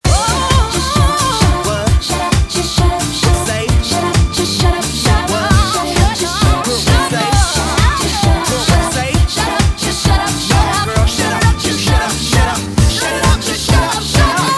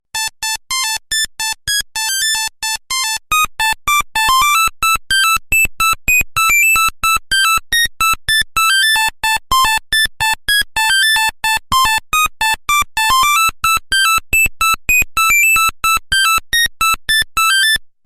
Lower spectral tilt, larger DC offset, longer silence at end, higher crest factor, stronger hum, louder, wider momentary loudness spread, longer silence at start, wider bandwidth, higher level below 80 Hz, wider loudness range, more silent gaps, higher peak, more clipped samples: first, -4 dB/octave vs 1.5 dB/octave; neither; second, 0 s vs 0.2 s; about the same, 12 dB vs 12 dB; neither; about the same, -13 LUFS vs -12 LUFS; second, 2 LU vs 6 LU; about the same, 0.05 s vs 0.15 s; second, 12 kHz vs 16 kHz; first, -18 dBFS vs -34 dBFS; about the same, 1 LU vs 3 LU; neither; about the same, 0 dBFS vs -2 dBFS; neither